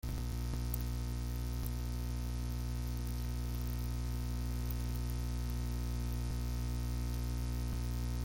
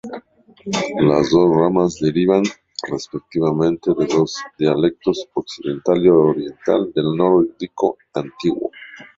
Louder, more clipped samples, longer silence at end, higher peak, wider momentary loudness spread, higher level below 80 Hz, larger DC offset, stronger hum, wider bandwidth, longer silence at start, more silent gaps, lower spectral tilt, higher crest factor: second, -39 LUFS vs -18 LUFS; neither; second, 0 s vs 0.15 s; second, -20 dBFS vs -2 dBFS; second, 1 LU vs 13 LU; first, -38 dBFS vs -52 dBFS; neither; first, 60 Hz at -40 dBFS vs none; first, 17 kHz vs 7.8 kHz; about the same, 0.05 s vs 0.05 s; neither; about the same, -6 dB/octave vs -6.5 dB/octave; about the same, 16 dB vs 16 dB